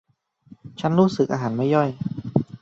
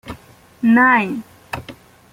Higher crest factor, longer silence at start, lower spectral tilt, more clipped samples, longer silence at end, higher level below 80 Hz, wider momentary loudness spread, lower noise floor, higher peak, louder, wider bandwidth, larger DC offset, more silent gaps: about the same, 20 dB vs 18 dB; first, 0.65 s vs 0.05 s; first, -8 dB/octave vs -6.5 dB/octave; neither; second, 0.05 s vs 0.4 s; about the same, -56 dBFS vs -52 dBFS; second, 9 LU vs 22 LU; first, -51 dBFS vs -45 dBFS; about the same, -2 dBFS vs -2 dBFS; second, -22 LUFS vs -15 LUFS; second, 7.8 kHz vs 16 kHz; neither; neither